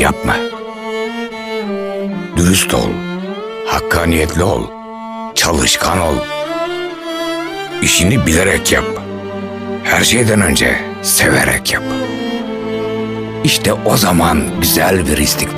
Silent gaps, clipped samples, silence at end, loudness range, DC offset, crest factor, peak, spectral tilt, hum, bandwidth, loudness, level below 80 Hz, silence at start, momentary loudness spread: none; under 0.1%; 0 s; 4 LU; 0.1%; 14 dB; 0 dBFS; -3.5 dB/octave; none; 15.5 kHz; -14 LUFS; -32 dBFS; 0 s; 12 LU